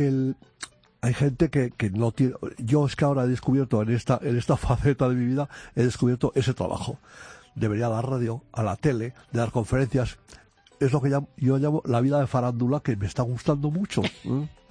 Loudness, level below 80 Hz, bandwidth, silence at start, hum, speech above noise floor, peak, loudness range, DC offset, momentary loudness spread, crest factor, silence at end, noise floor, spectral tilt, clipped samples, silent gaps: -25 LUFS; -46 dBFS; 10.5 kHz; 0 s; none; 20 dB; -8 dBFS; 3 LU; under 0.1%; 8 LU; 18 dB; 0.2 s; -44 dBFS; -7.5 dB/octave; under 0.1%; none